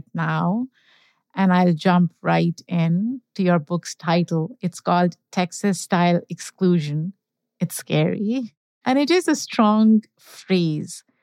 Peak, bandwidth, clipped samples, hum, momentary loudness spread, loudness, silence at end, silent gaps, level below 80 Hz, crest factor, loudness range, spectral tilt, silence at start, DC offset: -4 dBFS; 15 kHz; under 0.1%; none; 10 LU; -21 LUFS; 0.25 s; 8.57-8.81 s; -78 dBFS; 16 dB; 2 LU; -6 dB/octave; 0.15 s; under 0.1%